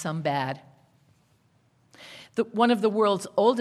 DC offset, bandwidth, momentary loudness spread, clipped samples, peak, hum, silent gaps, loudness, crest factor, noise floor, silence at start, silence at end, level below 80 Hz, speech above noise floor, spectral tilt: under 0.1%; 13 kHz; 18 LU; under 0.1%; -8 dBFS; none; none; -25 LUFS; 18 dB; -65 dBFS; 0 s; 0 s; -76 dBFS; 41 dB; -5.5 dB/octave